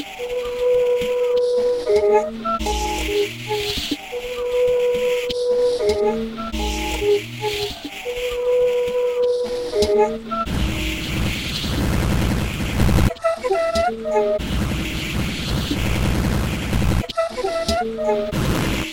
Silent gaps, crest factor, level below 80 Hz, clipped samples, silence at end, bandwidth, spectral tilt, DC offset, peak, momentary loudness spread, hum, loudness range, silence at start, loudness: none; 16 dB; -30 dBFS; under 0.1%; 0 s; 17 kHz; -5 dB/octave; under 0.1%; -4 dBFS; 6 LU; none; 2 LU; 0 s; -21 LUFS